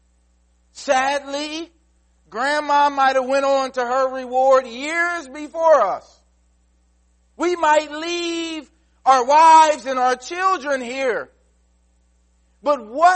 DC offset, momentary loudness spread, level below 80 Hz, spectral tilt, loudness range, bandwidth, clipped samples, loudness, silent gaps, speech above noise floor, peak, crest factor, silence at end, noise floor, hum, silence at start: under 0.1%; 14 LU; -60 dBFS; -1.5 dB/octave; 6 LU; 8.8 kHz; under 0.1%; -18 LUFS; none; 42 dB; -2 dBFS; 18 dB; 0 s; -60 dBFS; none; 0.75 s